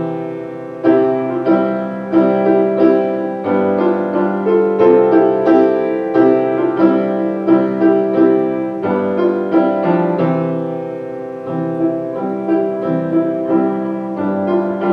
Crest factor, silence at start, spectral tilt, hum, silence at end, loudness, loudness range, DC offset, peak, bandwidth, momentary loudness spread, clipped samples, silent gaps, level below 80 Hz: 14 dB; 0 s; -10 dB/octave; none; 0 s; -15 LUFS; 5 LU; under 0.1%; -2 dBFS; 5.2 kHz; 9 LU; under 0.1%; none; -62 dBFS